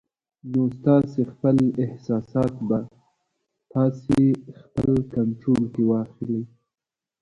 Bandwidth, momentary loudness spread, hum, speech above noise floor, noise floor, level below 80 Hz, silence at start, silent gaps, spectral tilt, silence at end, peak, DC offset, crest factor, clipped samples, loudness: 10 kHz; 10 LU; none; 68 dB; -90 dBFS; -52 dBFS; 0.45 s; none; -10 dB/octave; 0.75 s; -6 dBFS; under 0.1%; 18 dB; under 0.1%; -23 LUFS